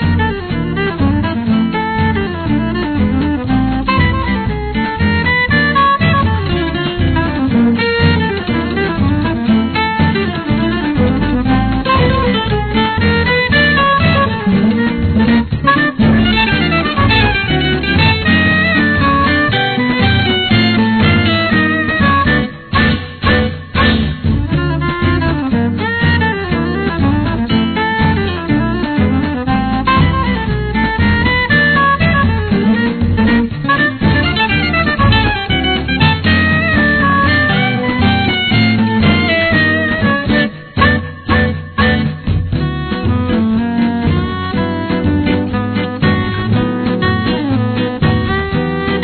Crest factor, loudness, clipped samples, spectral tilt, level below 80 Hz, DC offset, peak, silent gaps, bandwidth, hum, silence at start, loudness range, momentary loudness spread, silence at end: 12 dB; -13 LUFS; under 0.1%; -9.5 dB/octave; -26 dBFS; 0.2%; 0 dBFS; none; 4.6 kHz; none; 0 s; 4 LU; 6 LU; 0 s